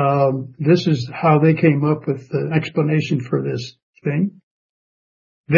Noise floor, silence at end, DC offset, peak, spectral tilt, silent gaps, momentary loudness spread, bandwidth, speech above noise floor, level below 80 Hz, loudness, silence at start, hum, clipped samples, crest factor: under -90 dBFS; 0 s; under 0.1%; 0 dBFS; -8 dB/octave; 3.83-3.93 s, 4.43-5.44 s; 10 LU; 7.2 kHz; over 72 dB; -60 dBFS; -19 LUFS; 0 s; none; under 0.1%; 18 dB